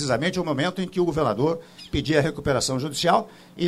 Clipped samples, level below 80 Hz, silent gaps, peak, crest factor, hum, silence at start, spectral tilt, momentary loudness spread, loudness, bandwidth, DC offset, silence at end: under 0.1%; -46 dBFS; none; -6 dBFS; 18 dB; none; 0 s; -5 dB/octave; 6 LU; -24 LUFS; 15.5 kHz; under 0.1%; 0 s